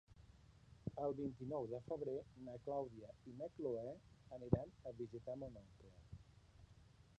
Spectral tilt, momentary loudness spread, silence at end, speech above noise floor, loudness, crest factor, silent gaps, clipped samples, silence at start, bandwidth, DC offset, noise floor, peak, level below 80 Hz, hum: -9.5 dB/octave; 24 LU; 0.05 s; 20 dB; -48 LUFS; 28 dB; none; under 0.1%; 0.1 s; 9.6 kHz; under 0.1%; -67 dBFS; -20 dBFS; -66 dBFS; none